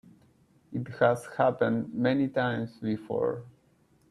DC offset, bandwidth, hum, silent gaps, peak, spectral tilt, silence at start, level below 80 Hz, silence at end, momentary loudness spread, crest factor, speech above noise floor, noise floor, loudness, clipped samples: under 0.1%; 12.5 kHz; none; none; -10 dBFS; -7.5 dB/octave; 0.7 s; -66 dBFS; 0.6 s; 11 LU; 20 dB; 37 dB; -65 dBFS; -29 LUFS; under 0.1%